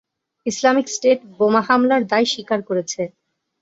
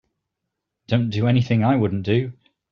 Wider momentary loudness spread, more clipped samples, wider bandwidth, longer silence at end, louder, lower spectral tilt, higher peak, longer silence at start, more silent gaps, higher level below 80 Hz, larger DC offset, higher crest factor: first, 11 LU vs 5 LU; neither; first, 8 kHz vs 6.6 kHz; first, 0.55 s vs 0.4 s; first, -18 LUFS vs -21 LUFS; second, -3.5 dB/octave vs -7 dB/octave; first, -2 dBFS vs -6 dBFS; second, 0.45 s vs 0.9 s; neither; second, -66 dBFS vs -56 dBFS; neither; about the same, 18 dB vs 16 dB